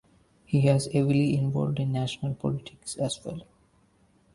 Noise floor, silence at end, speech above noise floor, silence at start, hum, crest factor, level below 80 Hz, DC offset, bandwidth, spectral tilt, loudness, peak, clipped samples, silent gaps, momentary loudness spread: -64 dBFS; 0.9 s; 37 dB; 0.5 s; none; 18 dB; -58 dBFS; under 0.1%; 11.5 kHz; -6.5 dB/octave; -27 LUFS; -8 dBFS; under 0.1%; none; 12 LU